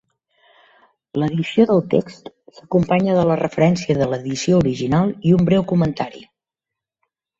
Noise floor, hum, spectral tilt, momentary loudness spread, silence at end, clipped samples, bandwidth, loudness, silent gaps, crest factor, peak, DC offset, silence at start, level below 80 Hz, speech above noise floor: -85 dBFS; none; -7 dB/octave; 7 LU; 1.15 s; under 0.1%; 7.8 kHz; -18 LUFS; none; 18 dB; -2 dBFS; under 0.1%; 1.15 s; -48 dBFS; 68 dB